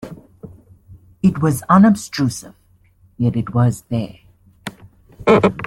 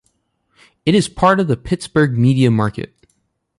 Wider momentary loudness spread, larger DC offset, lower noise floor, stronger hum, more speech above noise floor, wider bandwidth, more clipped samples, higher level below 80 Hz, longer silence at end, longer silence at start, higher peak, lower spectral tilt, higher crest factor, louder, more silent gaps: first, 22 LU vs 9 LU; neither; second, -53 dBFS vs -66 dBFS; neither; second, 37 dB vs 51 dB; first, 14 kHz vs 11.5 kHz; neither; about the same, -48 dBFS vs -44 dBFS; second, 0 s vs 0.75 s; second, 0.05 s vs 0.85 s; about the same, -2 dBFS vs -2 dBFS; about the same, -7 dB/octave vs -6.5 dB/octave; about the same, 16 dB vs 16 dB; about the same, -17 LUFS vs -16 LUFS; neither